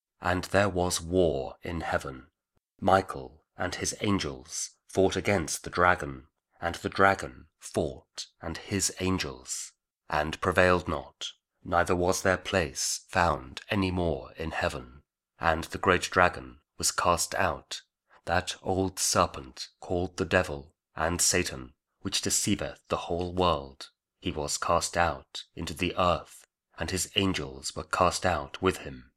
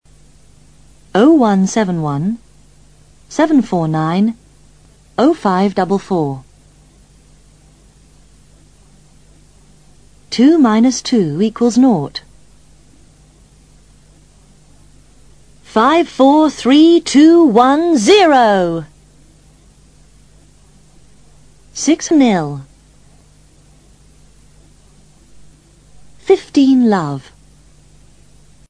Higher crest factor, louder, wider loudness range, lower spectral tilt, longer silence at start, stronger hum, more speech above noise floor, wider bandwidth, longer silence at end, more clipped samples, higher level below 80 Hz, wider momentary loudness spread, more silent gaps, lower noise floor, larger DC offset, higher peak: first, 26 dB vs 16 dB; second, -28 LUFS vs -12 LUFS; second, 2 LU vs 12 LU; second, -3.5 dB/octave vs -5.5 dB/octave; second, 0.2 s vs 1.15 s; neither; first, 42 dB vs 36 dB; first, 16.5 kHz vs 10.5 kHz; second, 0.15 s vs 1.5 s; neither; about the same, -50 dBFS vs -50 dBFS; about the same, 15 LU vs 15 LU; neither; first, -71 dBFS vs -47 dBFS; second, under 0.1% vs 0.3%; second, -4 dBFS vs 0 dBFS